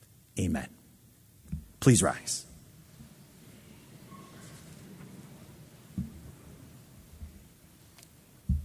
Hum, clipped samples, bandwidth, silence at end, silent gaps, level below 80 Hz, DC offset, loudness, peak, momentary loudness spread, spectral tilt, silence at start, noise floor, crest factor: none; under 0.1%; 16 kHz; 0 s; none; -46 dBFS; under 0.1%; -30 LUFS; -8 dBFS; 27 LU; -5 dB/octave; 0.35 s; -58 dBFS; 28 dB